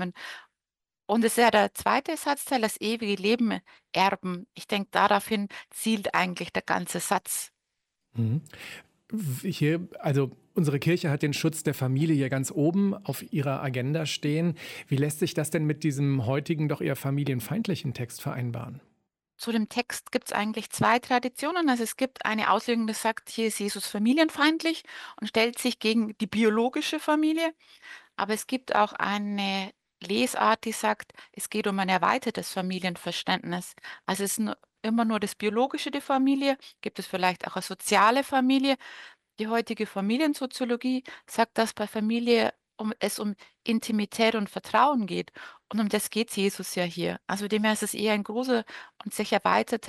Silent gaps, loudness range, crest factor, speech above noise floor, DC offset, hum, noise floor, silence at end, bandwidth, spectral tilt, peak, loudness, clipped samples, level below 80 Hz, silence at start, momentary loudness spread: none; 4 LU; 18 dB; over 63 dB; under 0.1%; none; under -90 dBFS; 0 s; 16.5 kHz; -5 dB/octave; -8 dBFS; -27 LUFS; under 0.1%; -70 dBFS; 0 s; 11 LU